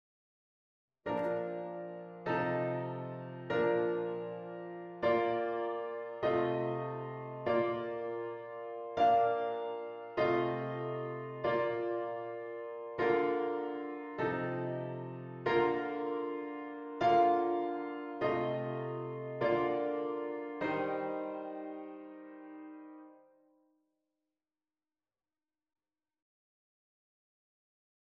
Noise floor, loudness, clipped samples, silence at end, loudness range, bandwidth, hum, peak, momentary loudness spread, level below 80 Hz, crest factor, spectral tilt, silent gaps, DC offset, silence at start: under -90 dBFS; -35 LUFS; under 0.1%; 4.85 s; 6 LU; 6.8 kHz; none; -18 dBFS; 13 LU; -72 dBFS; 18 dB; -8 dB/octave; none; under 0.1%; 1.05 s